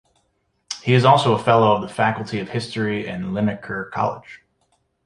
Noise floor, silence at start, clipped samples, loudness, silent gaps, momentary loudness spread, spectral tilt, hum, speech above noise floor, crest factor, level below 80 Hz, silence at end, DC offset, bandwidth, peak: -68 dBFS; 0.7 s; under 0.1%; -20 LUFS; none; 13 LU; -6 dB/octave; none; 49 dB; 20 dB; -56 dBFS; 0.7 s; under 0.1%; 11 kHz; 0 dBFS